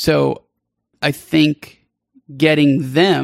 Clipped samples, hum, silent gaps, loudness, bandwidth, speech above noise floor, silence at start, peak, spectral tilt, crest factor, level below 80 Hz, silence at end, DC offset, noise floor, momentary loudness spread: under 0.1%; none; none; -16 LUFS; 15.5 kHz; 55 dB; 0 s; -2 dBFS; -6 dB/octave; 16 dB; -50 dBFS; 0 s; under 0.1%; -70 dBFS; 8 LU